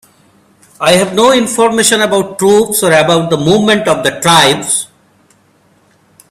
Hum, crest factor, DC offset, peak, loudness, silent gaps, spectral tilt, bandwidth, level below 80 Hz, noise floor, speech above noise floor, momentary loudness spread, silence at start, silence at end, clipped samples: none; 12 dB; under 0.1%; 0 dBFS; -9 LUFS; none; -3 dB/octave; over 20 kHz; -48 dBFS; -50 dBFS; 41 dB; 5 LU; 0.8 s; 1.45 s; 0.1%